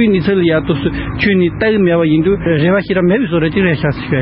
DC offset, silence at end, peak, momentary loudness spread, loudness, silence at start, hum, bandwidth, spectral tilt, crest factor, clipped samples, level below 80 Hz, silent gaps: under 0.1%; 0 s; -2 dBFS; 4 LU; -13 LUFS; 0 s; none; 5.6 kHz; -6 dB/octave; 12 dB; under 0.1%; -34 dBFS; none